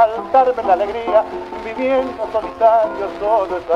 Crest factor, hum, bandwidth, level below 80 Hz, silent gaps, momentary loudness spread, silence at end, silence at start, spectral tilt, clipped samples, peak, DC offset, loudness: 14 dB; none; 7.4 kHz; -48 dBFS; none; 8 LU; 0 s; 0 s; -6 dB/octave; under 0.1%; -2 dBFS; under 0.1%; -17 LUFS